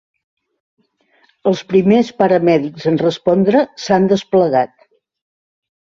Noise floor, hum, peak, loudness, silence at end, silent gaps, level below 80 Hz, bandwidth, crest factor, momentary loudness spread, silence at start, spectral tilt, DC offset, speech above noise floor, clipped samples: -57 dBFS; none; -2 dBFS; -15 LUFS; 1.2 s; none; -56 dBFS; 7.4 kHz; 14 dB; 6 LU; 1.45 s; -7 dB/octave; under 0.1%; 44 dB; under 0.1%